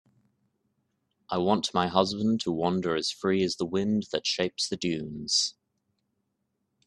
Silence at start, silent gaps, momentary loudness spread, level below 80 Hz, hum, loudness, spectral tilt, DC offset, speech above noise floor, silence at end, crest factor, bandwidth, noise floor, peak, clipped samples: 1.3 s; none; 5 LU; -66 dBFS; none; -28 LUFS; -4 dB/octave; under 0.1%; 51 dB; 1.35 s; 24 dB; 11.5 kHz; -79 dBFS; -4 dBFS; under 0.1%